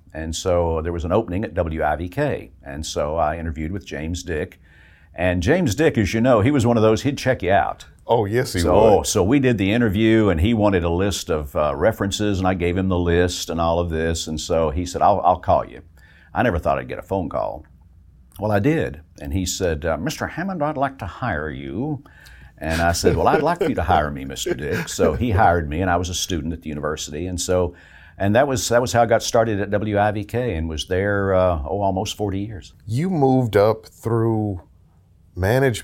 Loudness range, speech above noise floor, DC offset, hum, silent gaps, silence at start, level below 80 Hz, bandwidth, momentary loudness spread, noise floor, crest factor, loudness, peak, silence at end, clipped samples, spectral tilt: 6 LU; 33 dB; under 0.1%; none; none; 0.15 s; -36 dBFS; 17 kHz; 11 LU; -53 dBFS; 18 dB; -21 LUFS; -2 dBFS; 0 s; under 0.1%; -5.5 dB/octave